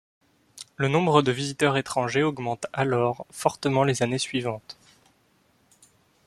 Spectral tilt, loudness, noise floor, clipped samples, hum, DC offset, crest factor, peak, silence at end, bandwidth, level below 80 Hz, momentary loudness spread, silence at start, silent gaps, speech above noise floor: -5 dB/octave; -25 LUFS; -64 dBFS; under 0.1%; none; under 0.1%; 24 dB; -2 dBFS; 1.55 s; 14 kHz; -62 dBFS; 15 LU; 0.55 s; none; 40 dB